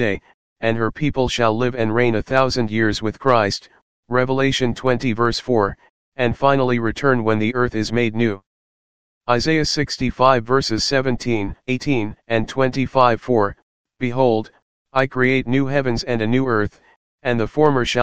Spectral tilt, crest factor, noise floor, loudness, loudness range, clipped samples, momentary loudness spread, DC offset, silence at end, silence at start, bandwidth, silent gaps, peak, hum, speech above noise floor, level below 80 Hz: -5.5 dB/octave; 18 dB; under -90 dBFS; -19 LUFS; 1 LU; under 0.1%; 7 LU; 2%; 0 s; 0 s; 9.6 kHz; 0.34-0.56 s, 3.82-4.03 s, 5.89-6.12 s, 8.46-9.21 s, 13.62-13.85 s, 14.62-14.85 s, 16.96-17.18 s; 0 dBFS; none; over 72 dB; -42 dBFS